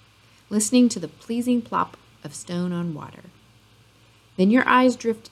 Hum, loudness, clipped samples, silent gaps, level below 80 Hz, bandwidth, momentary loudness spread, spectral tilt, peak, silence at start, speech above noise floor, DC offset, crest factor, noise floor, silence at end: none; -22 LUFS; under 0.1%; none; -64 dBFS; 14 kHz; 20 LU; -5 dB/octave; -2 dBFS; 0.5 s; 33 dB; under 0.1%; 20 dB; -55 dBFS; 0.15 s